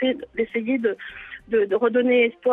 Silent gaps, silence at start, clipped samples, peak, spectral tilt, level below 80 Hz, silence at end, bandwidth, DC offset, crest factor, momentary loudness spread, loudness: none; 0 s; under 0.1%; -8 dBFS; -7 dB/octave; -60 dBFS; 0 s; 3.9 kHz; under 0.1%; 14 dB; 15 LU; -22 LUFS